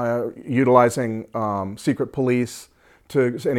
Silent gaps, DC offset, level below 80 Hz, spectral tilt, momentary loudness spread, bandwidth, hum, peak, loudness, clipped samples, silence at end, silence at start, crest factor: none; under 0.1%; -60 dBFS; -6.5 dB/octave; 10 LU; 16 kHz; none; 0 dBFS; -21 LUFS; under 0.1%; 0 s; 0 s; 20 dB